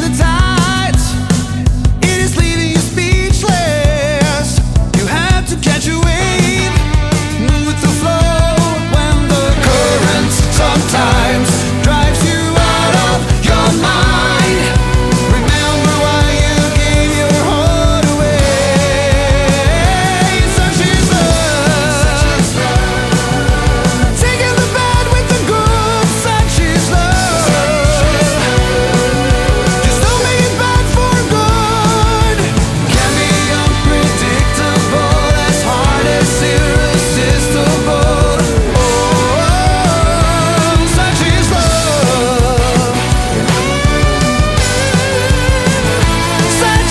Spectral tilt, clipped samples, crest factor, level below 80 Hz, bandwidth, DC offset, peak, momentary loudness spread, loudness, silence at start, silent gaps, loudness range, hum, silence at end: -4.5 dB/octave; under 0.1%; 10 dB; -18 dBFS; 12 kHz; under 0.1%; 0 dBFS; 2 LU; -11 LUFS; 0 s; none; 2 LU; none; 0 s